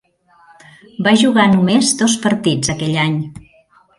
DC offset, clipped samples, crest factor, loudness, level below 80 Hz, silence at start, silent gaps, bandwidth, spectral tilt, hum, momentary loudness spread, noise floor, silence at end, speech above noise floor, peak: under 0.1%; under 0.1%; 16 dB; -14 LUFS; -50 dBFS; 1 s; none; 11.5 kHz; -4.5 dB/octave; none; 9 LU; -52 dBFS; 0.6 s; 38 dB; 0 dBFS